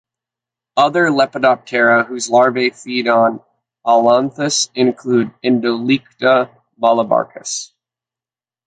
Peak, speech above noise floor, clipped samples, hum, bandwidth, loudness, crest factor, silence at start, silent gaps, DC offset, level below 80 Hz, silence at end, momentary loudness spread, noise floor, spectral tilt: 0 dBFS; over 75 dB; under 0.1%; none; 9.4 kHz; -15 LUFS; 16 dB; 0.75 s; none; under 0.1%; -64 dBFS; 1 s; 10 LU; under -90 dBFS; -3.5 dB/octave